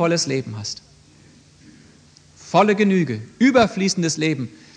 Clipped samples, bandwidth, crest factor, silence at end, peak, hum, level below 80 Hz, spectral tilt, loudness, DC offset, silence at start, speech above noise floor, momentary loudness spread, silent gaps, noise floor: under 0.1%; 10 kHz; 18 dB; 0.2 s; -2 dBFS; none; -58 dBFS; -5 dB/octave; -19 LUFS; under 0.1%; 0 s; 31 dB; 13 LU; none; -50 dBFS